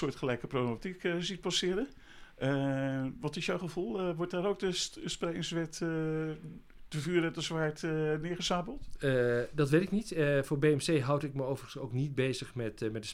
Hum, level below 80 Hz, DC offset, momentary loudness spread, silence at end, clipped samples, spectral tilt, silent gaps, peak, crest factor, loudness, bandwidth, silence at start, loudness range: none; -56 dBFS; under 0.1%; 8 LU; 0 s; under 0.1%; -5.5 dB/octave; none; -16 dBFS; 18 dB; -33 LUFS; 15.5 kHz; 0 s; 4 LU